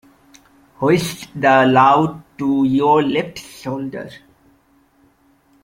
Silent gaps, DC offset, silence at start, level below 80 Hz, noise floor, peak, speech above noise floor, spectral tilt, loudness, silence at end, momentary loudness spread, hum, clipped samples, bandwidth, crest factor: none; under 0.1%; 0.8 s; -56 dBFS; -56 dBFS; 0 dBFS; 40 dB; -6 dB/octave; -16 LUFS; 1.45 s; 17 LU; none; under 0.1%; 16.5 kHz; 18 dB